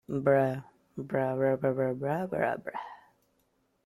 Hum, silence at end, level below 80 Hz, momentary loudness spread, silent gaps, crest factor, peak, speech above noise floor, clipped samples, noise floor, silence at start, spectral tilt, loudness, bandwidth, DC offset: none; 0.9 s; -68 dBFS; 16 LU; none; 20 dB; -12 dBFS; 44 dB; under 0.1%; -73 dBFS; 0.1 s; -9 dB/octave; -30 LUFS; 14 kHz; under 0.1%